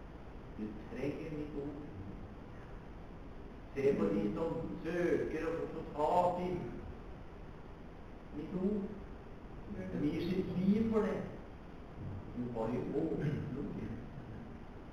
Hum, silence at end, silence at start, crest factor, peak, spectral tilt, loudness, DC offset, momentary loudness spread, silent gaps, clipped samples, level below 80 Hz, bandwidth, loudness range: none; 0 s; 0 s; 20 dB; -18 dBFS; -8.5 dB/octave; -38 LUFS; under 0.1%; 19 LU; none; under 0.1%; -52 dBFS; 11.5 kHz; 8 LU